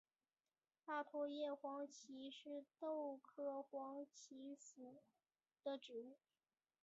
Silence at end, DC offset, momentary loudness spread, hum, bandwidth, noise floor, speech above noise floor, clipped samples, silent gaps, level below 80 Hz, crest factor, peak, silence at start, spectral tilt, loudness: 0.65 s; under 0.1%; 12 LU; none; 8 kHz; under -90 dBFS; over 39 dB; under 0.1%; none; under -90 dBFS; 18 dB; -34 dBFS; 0.85 s; -1 dB/octave; -51 LUFS